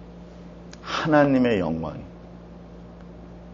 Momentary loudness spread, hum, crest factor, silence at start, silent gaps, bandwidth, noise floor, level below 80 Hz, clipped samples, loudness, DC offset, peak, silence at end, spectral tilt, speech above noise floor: 25 LU; none; 22 dB; 0 s; none; 7.4 kHz; -43 dBFS; -48 dBFS; under 0.1%; -22 LUFS; under 0.1%; -4 dBFS; 0 s; -5 dB/octave; 22 dB